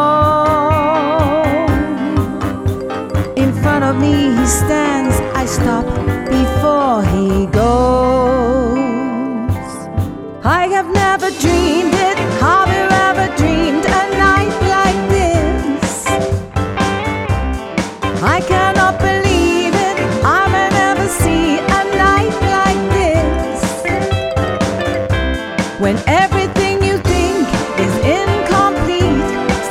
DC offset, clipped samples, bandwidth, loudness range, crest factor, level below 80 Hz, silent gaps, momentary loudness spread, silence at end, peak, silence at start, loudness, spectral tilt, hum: under 0.1%; under 0.1%; 16 kHz; 3 LU; 14 dB; -26 dBFS; none; 7 LU; 0 s; 0 dBFS; 0 s; -14 LUFS; -5.5 dB/octave; none